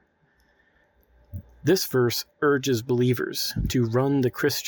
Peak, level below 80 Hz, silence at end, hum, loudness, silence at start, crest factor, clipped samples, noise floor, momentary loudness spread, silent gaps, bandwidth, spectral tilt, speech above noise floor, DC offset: -10 dBFS; -44 dBFS; 0 s; none; -24 LUFS; 1.35 s; 16 dB; under 0.1%; -65 dBFS; 7 LU; none; 19.5 kHz; -5 dB/octave; 41 dB; under 0.1%